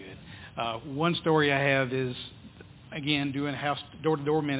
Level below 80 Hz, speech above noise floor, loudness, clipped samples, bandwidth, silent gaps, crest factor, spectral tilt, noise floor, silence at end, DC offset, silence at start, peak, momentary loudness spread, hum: -58 dBFS; 21 dB; -28 LUFS; under 0.1%; 4 kHz; none; 20 dB; -9.5 dB/octave; -49 dBFS; 0 s; under 0.1%; 0 s; -10 dBFS; 17 LU; none